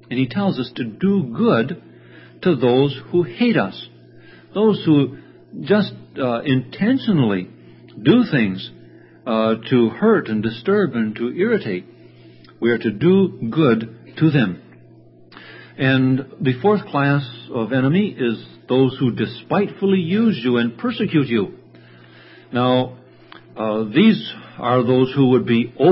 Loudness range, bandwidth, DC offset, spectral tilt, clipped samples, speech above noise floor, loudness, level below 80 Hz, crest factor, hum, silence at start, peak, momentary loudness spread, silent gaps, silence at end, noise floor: 2 LU; 5.8 kHz; under 0.1%; -12 dB/octave; under 0.1%; 29 dB; -19 LUFS; -58 dBFS; 18 dB; none; 0.1 s; -2 dBFS; 11 LU; none; 0 s; -47 dBFS